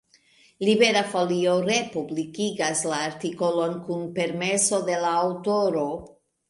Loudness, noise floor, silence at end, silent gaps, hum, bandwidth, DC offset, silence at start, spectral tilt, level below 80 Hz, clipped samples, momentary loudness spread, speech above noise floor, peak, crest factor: -24 LUFS; -59 dBFS; 0.45 s; none; none; 11.5 kHz; under 0.1%; 0.6 s; -3.5 dB/octave; -66 dBFS; under 0.1%; 10 LU; 35 dB; -6 dBFS; 18 dB